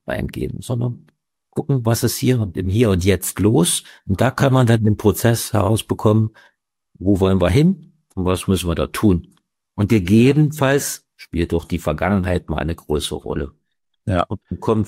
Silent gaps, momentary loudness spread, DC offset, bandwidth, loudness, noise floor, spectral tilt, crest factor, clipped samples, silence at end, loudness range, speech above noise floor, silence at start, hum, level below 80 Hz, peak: none; 11 LU; under 0.1%; 16 kHz; -19 LUFS; -67 dBFS; -6 dB/octave; 16 dB; under 0.1%; 0 s; 4 LU; 49 dB; 0.05 s; none; -38 dBFS; -4 dBFS